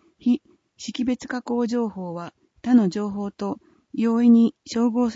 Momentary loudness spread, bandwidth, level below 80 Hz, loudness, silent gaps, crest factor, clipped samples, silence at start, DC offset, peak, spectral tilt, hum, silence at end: 17 LU; 7.8 kHz; -62 dBFS; -22 LUFS; none; 16 dB; under 0.1%; 0.25 s; under 0.1%; -6 dBFS; -6.5 dB/octave; none; 0 s